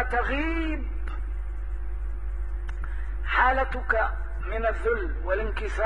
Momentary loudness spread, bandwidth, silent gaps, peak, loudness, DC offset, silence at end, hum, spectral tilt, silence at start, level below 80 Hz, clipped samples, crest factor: 12 LU; 6 kHz; none; -10 dBFS; -29 LUFS; 2%; 0 s; none; -7 dB/octave; 0 s; -30 dBFS; under 0.1%; 18 dB